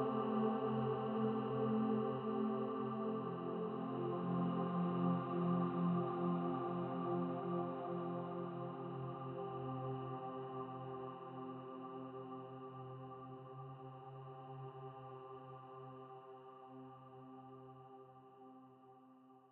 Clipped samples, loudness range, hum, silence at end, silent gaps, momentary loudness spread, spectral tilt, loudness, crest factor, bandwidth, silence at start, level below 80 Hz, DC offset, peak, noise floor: under 0.1%; 16 LU; none; 0.05 s; none; 19 LU; -8 dB/octave; -42 LUFS; 16 dB; 4.2 kHz; 0 s; -84 dBFS; under 0.1%; -26 dBFS; -64 dBFS